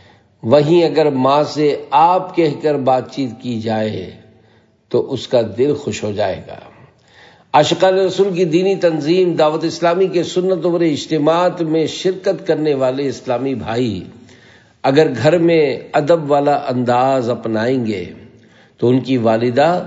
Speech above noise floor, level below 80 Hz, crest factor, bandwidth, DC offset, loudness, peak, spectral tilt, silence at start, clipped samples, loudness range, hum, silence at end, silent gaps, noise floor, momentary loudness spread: 37 dB; -60 dBFS; 16 dB; 7.8 kHz; under 0.1%; -16 LUFS; 0 dBFS; -6.5 dB/octave; 0.45 s; under 0.1%; 5 LU; none; 0 s; none; -52 dBFS; 8 LU